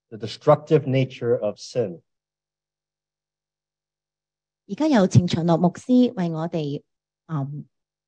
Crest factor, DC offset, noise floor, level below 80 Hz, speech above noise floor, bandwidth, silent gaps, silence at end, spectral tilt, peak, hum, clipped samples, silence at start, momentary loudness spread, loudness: 20 dB; under 0.1%; under -90 dBFS; -60 dBFS; over 69 dB; 9.2 kHz; none; 0.45 s; -7.5 dB/octave; -4 dBFS; 50 Hz at -55 dBFS; under 0.1%; 0.1 s; 14 LU; -22 LUFS